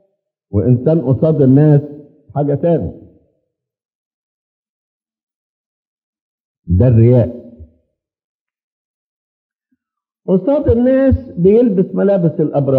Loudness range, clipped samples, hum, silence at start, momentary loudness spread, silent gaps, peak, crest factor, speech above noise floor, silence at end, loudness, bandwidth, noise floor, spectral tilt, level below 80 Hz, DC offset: 9 LU; under 0.1%; none; 0.55 s; 11 LU; 3.85-3.89 s, 3.95-5.00 s, 5.23-5.27 s, 5.35-5.97 s, 6.03-6.13 s, 6.21-6.63 s, 8.24-8.46 s, 8.64-9.50 s; 0 dBFS; 16 dB; 71 dB; 0 s; -13 LUFS; 4.1 kHz; -83 dBFS; -13 dB/octave; -40 dBFS; under 0.1%